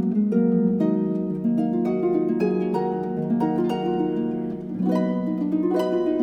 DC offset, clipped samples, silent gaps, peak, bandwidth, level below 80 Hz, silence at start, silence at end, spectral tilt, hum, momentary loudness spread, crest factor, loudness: under 0.1%; under 0.1%; none; -10 dBFS; 8.6 kHz; -58 dBFS; 0 s; 0 s; -9.5 dB/octave; none; 5 LU; 12 dB; -23 LUFS